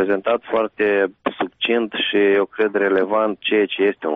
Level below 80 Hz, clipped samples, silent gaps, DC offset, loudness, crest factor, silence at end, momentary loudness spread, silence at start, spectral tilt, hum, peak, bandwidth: -62 dBFS; under 0.1%; none; under 0.1%; -19 LUFS; 12 dB; 0 s; 5 LU; 0 s; -1.5 dB/octave; none; -6 dBFS; 3.9 kHz